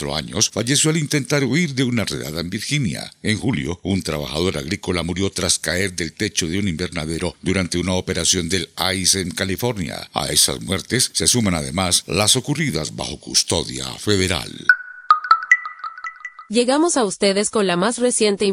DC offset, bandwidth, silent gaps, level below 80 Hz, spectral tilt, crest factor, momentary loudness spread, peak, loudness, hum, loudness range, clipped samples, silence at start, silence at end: under 0.1%; 16.5 kHz; none; -46 dBFS; -3 dB/octave; 20 dB; 9 LU; 0 dBFS; -19 LUFS; none; 4 LU; under 0.1%; 0 s; 0 s